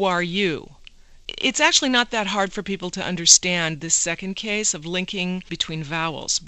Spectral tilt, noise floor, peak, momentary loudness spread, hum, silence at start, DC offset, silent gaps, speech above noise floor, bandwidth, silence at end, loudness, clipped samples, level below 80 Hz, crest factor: -1.5 dB/octave; -46 dBFS; 0 dBFS; 13 LU; none; 0 s; under 0.1%; none; 24 dB; 14 kHz; 0 s; -20 LUFS; under 0.1%; -50 dBFS; 22 dB